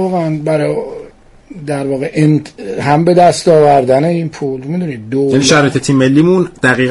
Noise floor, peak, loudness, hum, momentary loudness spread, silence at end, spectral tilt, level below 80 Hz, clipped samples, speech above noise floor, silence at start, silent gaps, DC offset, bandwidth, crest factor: -36 dBFS; 0 dBFS; -12 LUFS; none; 12 LU; 0 s; -5.5 dB/octave; -46 dBFS; under 0.1%; 25 dB; 0 s; none; under 0.1%; 11.5 kHz; 12 dB